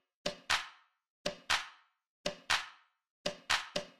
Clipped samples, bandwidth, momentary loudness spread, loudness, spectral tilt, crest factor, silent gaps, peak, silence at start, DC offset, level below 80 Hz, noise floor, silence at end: under 0.1%; 14 kHz; 10 LU; -36 LUFS; -1 dB/octave; 24 dB; 1.10-1.25 s, 2.09-2.24 s, 3.10-3.25 s; -16 dBFS; 0.25 s; under 0.1%; -64 dBFS; -56 dBFS; 0.1 s